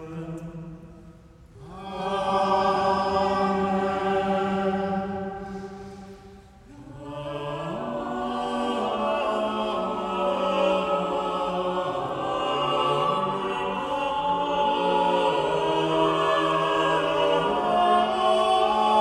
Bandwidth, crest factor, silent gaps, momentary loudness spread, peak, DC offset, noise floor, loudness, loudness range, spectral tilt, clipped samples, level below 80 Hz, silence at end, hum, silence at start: 12 kHz; 16 dB; none; 15 LU; -10 dBFS; under 0.1%; -49 dBFS; -24 LUFS; 9 LU; -5.5 dB/octave; under 0.1%; -54 dBFS; 0 s; none; 0 s